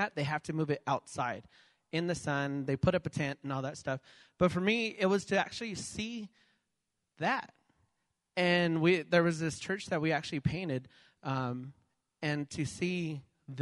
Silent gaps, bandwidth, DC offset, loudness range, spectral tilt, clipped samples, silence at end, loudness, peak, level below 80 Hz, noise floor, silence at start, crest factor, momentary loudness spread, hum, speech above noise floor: none; 11.5 kHz; under 0.1%; 5 LU; -5.5 dB/octave; under 0.1%; 0 s; -33 LUFS; -12 dBFS; -62 dBFS; -85 dBFS; 0 s; 20 dB; 12 LU; none; 52 dB